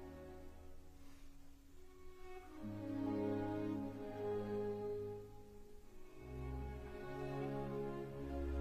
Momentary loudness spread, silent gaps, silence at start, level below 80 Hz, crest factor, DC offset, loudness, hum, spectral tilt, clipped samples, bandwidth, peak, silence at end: 21 LU; none; 0 s; -56 dBFS; 16 dB; under 0.1%; -45 LUFS; none; -8 dB/octave; under 0.1%; 15 kHz; -30 dBFS; 0 s